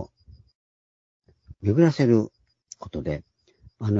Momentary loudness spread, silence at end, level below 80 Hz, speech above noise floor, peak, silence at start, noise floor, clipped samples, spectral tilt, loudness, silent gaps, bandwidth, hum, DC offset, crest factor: 18 LU; 0 s; -52 dBFS; 35 dB; -6 dBFS; 0 s; -56 dBFS; under 0.1%; -8 dB/octave; -24 LUFS; 0.55-1.20 s; 7.8 kHz; none; under 0.1%; 20 dB